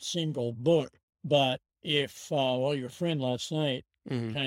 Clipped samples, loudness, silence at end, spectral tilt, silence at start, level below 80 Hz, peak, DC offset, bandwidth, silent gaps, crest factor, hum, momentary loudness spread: under 0.1%; -30 LUFS; 0 s; -5 dB/octave; 0 s; -70 dBFS; -12 dBFS; under 0.1%; 16.5 kHz; 1.03-1.08 s; 18 dB; none; 10 LU